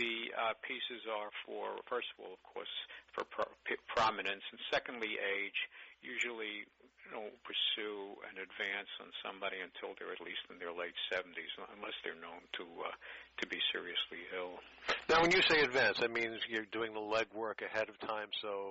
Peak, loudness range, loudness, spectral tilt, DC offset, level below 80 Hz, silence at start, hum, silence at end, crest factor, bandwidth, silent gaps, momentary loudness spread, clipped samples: -20 dBFS; 10 LU; -38 LUFS; 0 dB/octave; under 0.1%; -70 dBFS; 0 s; none; 0 s; 18 dB; 7.6 kHz; none; 14 LU; under 0.1%